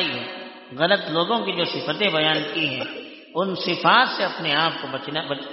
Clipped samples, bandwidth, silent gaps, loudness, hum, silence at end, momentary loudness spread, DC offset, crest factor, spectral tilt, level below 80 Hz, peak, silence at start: under 0.1%; 6 kHz; none; -22 LUFS; none; 0 s; 14 LU; under 0.1%; 20 dB; -1 dB/octave; -68 dBFS; -4 dBFS; 0 s